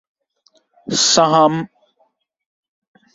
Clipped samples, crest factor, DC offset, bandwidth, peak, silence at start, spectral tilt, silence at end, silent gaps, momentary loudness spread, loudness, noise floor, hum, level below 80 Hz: under 0.1%; 18 dB; under 0.1%; 8 kHz; -2 dBFS; 0.85 s; -3 dB/octave; 1.5 s; none; 21 LU; -14 LUFS; -63 dBFS; none; -62 dBFS